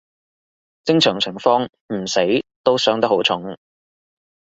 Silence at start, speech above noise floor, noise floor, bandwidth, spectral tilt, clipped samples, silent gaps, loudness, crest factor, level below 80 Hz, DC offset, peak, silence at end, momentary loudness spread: 0.85 s; over 72 dB; under -90 dBFS; 8 kHz; -4 dB/octave; under 0.1%; 1.81-1.89 s, 2.56-2.64 s; -18 LUFS; 20 dB; -60 dBFS; under 0.1%; 0 dBFS; 0.95 s; 11 LU